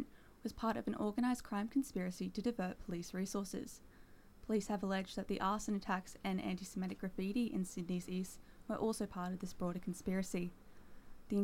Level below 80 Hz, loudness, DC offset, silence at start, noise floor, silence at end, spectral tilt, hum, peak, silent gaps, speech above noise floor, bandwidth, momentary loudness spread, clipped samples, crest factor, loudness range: -60 dBFS; -41 LUFS; under 0.1%; 0 s; -60 dBFS; 0 s; -6 dB/octave; none; -24 dBFS; none; 20 dB; 16.5 kHz; 8 LU; under 0.1%; 16 dB; 2 LU